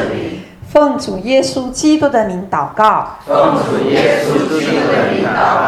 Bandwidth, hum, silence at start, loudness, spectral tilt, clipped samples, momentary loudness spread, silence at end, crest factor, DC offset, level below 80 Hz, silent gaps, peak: 14 kHz; none; 0 s; -13 LUFS; -5 dB/octave; under 0.1%; 6 LU; 0 s; 14 dB; under 0.1%; -44 dBFS; none; 0 dBFS